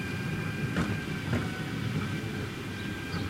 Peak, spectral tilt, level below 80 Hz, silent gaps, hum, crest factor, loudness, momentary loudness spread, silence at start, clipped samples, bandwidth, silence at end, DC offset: -16 dBFS; -6 dB/octave; -50 dBFS; none; none; 16 dB; -33 LUFS; 5 LU; 0 s; under 0.1%; 16 kHz; 0 s; under 0.1%